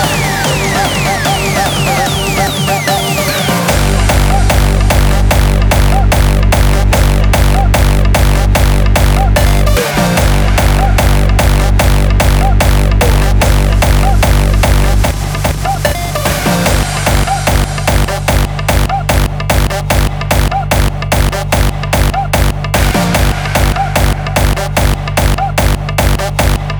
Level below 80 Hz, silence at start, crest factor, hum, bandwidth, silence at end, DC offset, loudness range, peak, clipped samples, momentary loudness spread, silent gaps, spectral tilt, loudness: -12 dBFS; 0 s; 10 dB; none; over 20 kHz; 0 s; under 0.1%; 2 LU; 0 dBFS; under 0.1%; 3 LU; none; -4.5 dB/octave; -11 LUFS